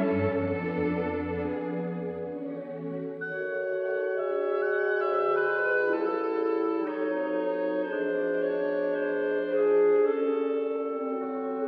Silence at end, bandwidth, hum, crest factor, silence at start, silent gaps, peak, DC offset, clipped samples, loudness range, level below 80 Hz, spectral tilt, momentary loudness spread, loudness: 0 s; 5 kHz; none; 14 dB; 0 s; none; -14 dBFS; under 0.1%; under 0.1%; 5 LU; -64 dBFS; -9.5 dB/octave; 9 LU; -28 LUFS